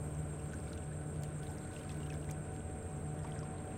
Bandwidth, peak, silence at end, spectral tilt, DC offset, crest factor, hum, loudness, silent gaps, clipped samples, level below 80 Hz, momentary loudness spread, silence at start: 16 kHz; -30 dBFS; 0 s; -6 dB/octave; under 0.1%; 12 dB; none; -43 LUFS; none; under 0.1%; -52 dBFS; 2 LU; 0 s